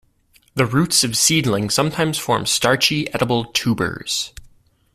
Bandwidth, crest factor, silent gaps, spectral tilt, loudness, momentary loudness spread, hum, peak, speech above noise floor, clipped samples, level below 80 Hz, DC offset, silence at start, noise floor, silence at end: 16 kHz; 18 dB; none; -3 dB/octave; -18 LUFS; 8 LU; none; -2 dBFS; 39 dB; under 0.1%; -48 dBFS; under 0.1%; 0.55 s; -57 dBFS; 0.5 s